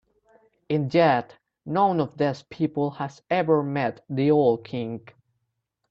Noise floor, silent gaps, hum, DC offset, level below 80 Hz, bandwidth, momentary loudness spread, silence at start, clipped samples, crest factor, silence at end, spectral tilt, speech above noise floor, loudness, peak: -78 dBFS; none; none; under 0.1%; -66 dBFS; 7.4 kHz; 12 LU; 0.7 s; under 0.1%; 18 dB; 0.9 s; -8 dB/octave; 54 dB; -24 LUFS; -6 dBFS